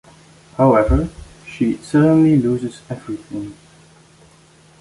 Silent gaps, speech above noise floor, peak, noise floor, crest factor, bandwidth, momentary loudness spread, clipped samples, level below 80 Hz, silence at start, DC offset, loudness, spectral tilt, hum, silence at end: none; 33 dB; -2 dBFS; -49 dBFS; 16 dB; 11.5 kHz; 21 LU; under 0.1%; -32 dBFS; 0.6 s; under 0.1%; -17 LUFS; -8.5 dB/octave; none; 1.25 s